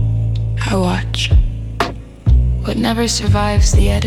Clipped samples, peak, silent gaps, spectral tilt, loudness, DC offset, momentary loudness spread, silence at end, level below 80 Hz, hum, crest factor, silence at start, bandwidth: under 0.1%; 0 dBFS; none; -5 dB/octave; -16 LUFS; under 0.1%; 8 LU; 0 s; -18 dBFS; none; 14 dB; 0 s; 13 kHz